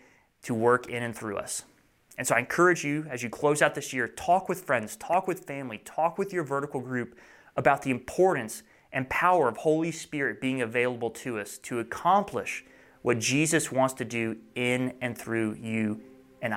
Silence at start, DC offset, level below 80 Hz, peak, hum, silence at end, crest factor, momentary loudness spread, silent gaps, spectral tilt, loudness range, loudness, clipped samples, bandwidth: 0.45 s; under 0.1%; -64 dBFS; -8 dBFS; none; 0 s; 22 dB; 11 LU; none; -4.5 dB/octave; 3 LU; -28 LUFS; under 0.1%; 16.5 kHz